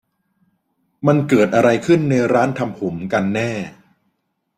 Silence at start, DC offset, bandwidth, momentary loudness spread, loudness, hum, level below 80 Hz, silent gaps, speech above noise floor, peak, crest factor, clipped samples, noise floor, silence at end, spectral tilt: 1 s; under 0.1%; 15 kHz; 10 LU; -17 LUFS; none; -56 dBFS; none; 54 dB; -2 dBFS; 16 dB; under 0.1%; -70 dBFS; 0.85 s; -7 dB/octave